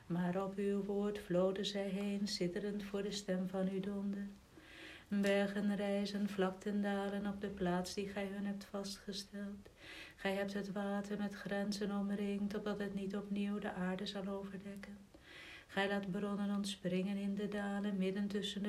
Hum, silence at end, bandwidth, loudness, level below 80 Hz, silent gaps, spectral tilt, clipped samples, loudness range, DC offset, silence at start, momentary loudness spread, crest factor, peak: none; 0 s; 14.5 kHz; -40 LUFS; -68 dBFS; none; -6 dB/octave; under 0.1%; 4 LU; under 0.1%; 0 s; 12 LU; 18 dB; -22 dBFS